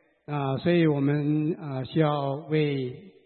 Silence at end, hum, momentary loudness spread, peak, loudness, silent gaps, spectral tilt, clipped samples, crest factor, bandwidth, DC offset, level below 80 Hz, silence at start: 0.15 s; none; 10 LU; -10 dBFS; -26 LUFS; none; -12 dB/octave; under 0.1%; 16 dB; 4.4 kHz; under 0.1%; -66 dBFS; 0.3 s